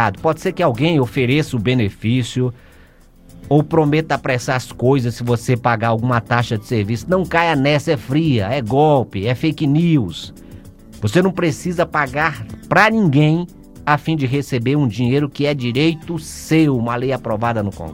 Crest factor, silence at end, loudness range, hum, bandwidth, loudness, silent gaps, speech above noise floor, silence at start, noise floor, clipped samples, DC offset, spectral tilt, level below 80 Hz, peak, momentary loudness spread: 18 dB; 0 s; 2 LU; none; 16.5 kHz; -17 LUFS; none; 29 dB; 0 s; -46 dBFS; under 0.1%; under 0.1%; -6.5 dB/octave; -44 dBFS; 0 dBFS; 6 LU